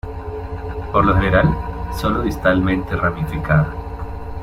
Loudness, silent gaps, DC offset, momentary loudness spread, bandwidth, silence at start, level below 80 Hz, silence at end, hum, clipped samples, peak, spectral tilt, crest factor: -19 LUFS; none; under 0.1%; 14 LU; 15.5 kHz; 0.05 s; -28 dBFS; 0 s; none; under 0.1%; -2 dBFS; -7.5 dB/octave; 18 dB